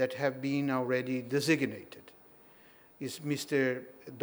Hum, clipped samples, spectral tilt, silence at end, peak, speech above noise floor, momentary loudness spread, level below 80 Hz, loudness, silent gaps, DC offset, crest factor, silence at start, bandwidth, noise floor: none; under 0.1%; -5.5 dB/octave; 0 s; -14 dBFS; 25 dB; 19 LU; -80 dBFS; -32 LUFS; none; under 0.1%; 20 dB; 0 s; over 20 kHz; -57 dBFS